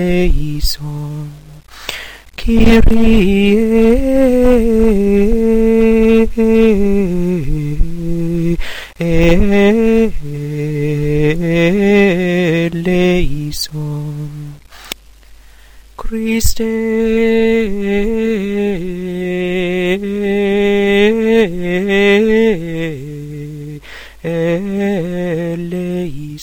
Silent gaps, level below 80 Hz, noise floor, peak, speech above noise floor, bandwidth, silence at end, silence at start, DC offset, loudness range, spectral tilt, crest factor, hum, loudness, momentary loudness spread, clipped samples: none; -22 dBFS; -40 dBFS; 0 dBFS; 30 dB; 18 kHz; 0 s; 0 s; under 0.1%; 8 LU; -6.5 dB/octave; 12 dB; none; -14 LUFS; 15 LU; under 0.1%